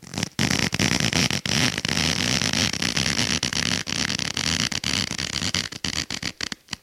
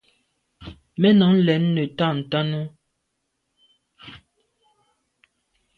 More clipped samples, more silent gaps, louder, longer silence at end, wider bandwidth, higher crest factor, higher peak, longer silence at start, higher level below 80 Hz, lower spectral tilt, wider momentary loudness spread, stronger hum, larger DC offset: neither; neither; second, -23 LUFS vs -20 LUFS; second, 0.1 s vs 1.6 s; first, 16.5 kHz vs 4.9 kHz; about the same, 22 dB vs 18 dB; first, -2 dBFS vs -6 dBFS; second, 0 s vs 0.6 s; first, -44 dBFS vs -58 dBFS; second, -2.5 dB/octave vs -9 dB/octave; second, 6 LU vs 27 LU; neither; neither